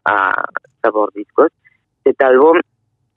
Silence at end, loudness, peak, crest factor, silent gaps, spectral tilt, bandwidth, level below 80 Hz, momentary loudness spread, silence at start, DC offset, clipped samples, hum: 0.55 s; -14 LUFS; 0 dBFS; 14 dB; none; -7.5 dB/octave; 4.1 kHz; -64 dBFS; 10 LU; 0.05 s; under 0.1%; under 0.1%; none